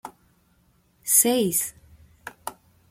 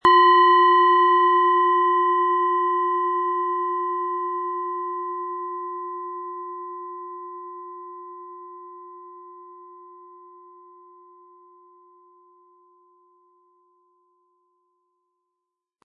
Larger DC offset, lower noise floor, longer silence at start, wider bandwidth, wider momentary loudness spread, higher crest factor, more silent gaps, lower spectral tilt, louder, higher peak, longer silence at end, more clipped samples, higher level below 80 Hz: neither; second, -63 dBFS vs -83 dBFS; about the same, 0.05 s vs 0.05 s; first, 16.5 kHz vs 4.5 kHz; about the same, 26 LU vs 25 LU; about the same, 24 dB vs 20 dB; neither; second, -2.5 dB/octave vs -5 dB/octave; about the same, -20 LUFS vs -20 LUFS; about the same, -4 dBFS vs -4 dBFS; second, 0.4 s vs 6.05 s; neither; first, -62 dBFS vs -70 dBFS